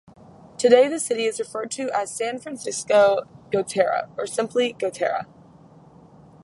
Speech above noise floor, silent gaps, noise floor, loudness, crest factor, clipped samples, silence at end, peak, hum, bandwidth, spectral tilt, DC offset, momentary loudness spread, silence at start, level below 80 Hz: 27 dB; none; -49 dBFS; -22 LUFS; 22 dB; under 0.1%; 1.2 s; -2 dBFS; none; 11.5 kHz; -3 dB/octave; under 0.1%; 12 LU; 0.6 s; -66 dBFS